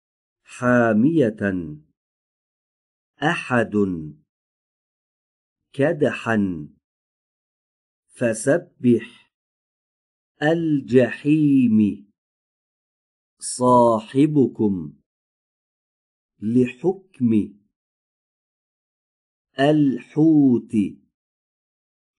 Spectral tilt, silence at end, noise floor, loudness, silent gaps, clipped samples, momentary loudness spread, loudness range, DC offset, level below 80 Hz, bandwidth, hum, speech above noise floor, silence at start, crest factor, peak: -6.5 dB/octave; 1.25 s; under -90 dBFS; -20 LUFS; 1.97-3.14 s, 4.29-5.56 s, 6.84-8.03 s, 9.34-10.35 s, 12.18-13.37 s, 15.06-16.29 s, 17.76-19.45 s; under 0.1%; 14 LU; 6 LU; under 0.1%; -62 dBFS; 11.5 kHz; none; over 71 dB; 0.5 s; 20 dB; -2 dBFS